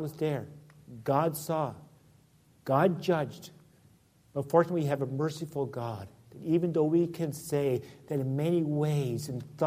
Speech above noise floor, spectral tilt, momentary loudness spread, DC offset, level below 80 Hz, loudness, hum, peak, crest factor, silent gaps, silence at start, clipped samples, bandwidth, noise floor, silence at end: 33 dB; -7 dB/octave; 13 LU; under 0.1%; -68 dBFS; -30 LUFS; none; -10 dBFS; 22 dB; none; 0 s; under 0.1%; 15.5 kHz; -62 dBFS; 0 s